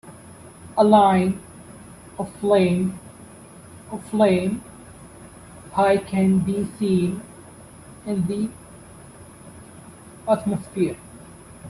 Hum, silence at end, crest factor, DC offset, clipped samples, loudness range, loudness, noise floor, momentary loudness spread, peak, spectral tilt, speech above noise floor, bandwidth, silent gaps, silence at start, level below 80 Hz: none; 0 s; 22 dB; under 0.1%; under 0.1%; 8 LU; -21 LUFS; -44 dBFS; 25 LU; -2 dBFS; -7 dB/octave; 24 dB; 12.5 kHz; none; 0.05 s; -56 dBFS